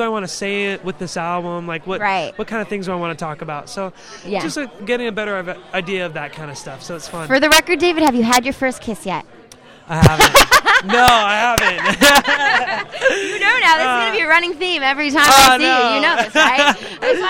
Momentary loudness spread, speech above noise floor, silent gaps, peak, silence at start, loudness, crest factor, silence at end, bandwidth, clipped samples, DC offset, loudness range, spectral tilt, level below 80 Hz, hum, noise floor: 17 LU; 27 dB; none; 0 dBFS; 0 s; -14 LUFS; 16 dB; 0 s; 17.5 kHz; under 0.1%; under 0.1%; 12 LU; -3 dB/octave; -38 dBFS; none; -43 dBFS